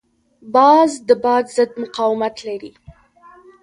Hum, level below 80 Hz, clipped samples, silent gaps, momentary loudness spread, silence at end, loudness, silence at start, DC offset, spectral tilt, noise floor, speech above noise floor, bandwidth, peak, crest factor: none; -58 dBFS; under 0.1%; none; 15 LU; 0.95 s; -16 LUFS; 0.45 s; under 0.1%; -4 dB/octave; -47 dBFS; 31 dB; 11 kHz; 0 dBFS; 18 dB